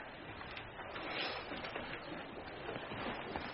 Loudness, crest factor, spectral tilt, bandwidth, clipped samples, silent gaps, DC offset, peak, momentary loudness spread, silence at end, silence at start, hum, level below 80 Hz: -44 LUFS; 20 dB; -2 dB/octave; 5.8 kHz; under 0.1%; none; under 0.1%; -26 dBFS; 7 LU; 0 s; 0 s; none; -62 dBFS